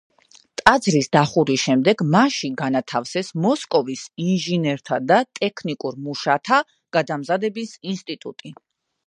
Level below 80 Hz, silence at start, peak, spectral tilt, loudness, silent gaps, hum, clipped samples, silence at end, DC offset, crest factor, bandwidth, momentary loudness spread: -56 dBFS; 0.6 s; 0 dBFS; -5 dB/octave; -20 LUFS; none; none; under 0.1%; 0.55 s; under 0.1%; 20 dB; 11.5 kHz; 12 LU